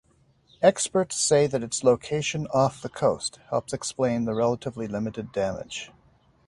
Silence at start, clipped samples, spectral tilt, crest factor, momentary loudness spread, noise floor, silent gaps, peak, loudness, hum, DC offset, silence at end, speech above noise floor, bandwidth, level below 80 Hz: 0.6 s; under 0.1%; -4.5 dB/octave; 22 dB; 10 LU; -62 dBFS; none; -4 dBFS; -25 LUFS; none; under 0.1%; 0.6 s; 37 dB; 11.5 kHz; -58 dBFS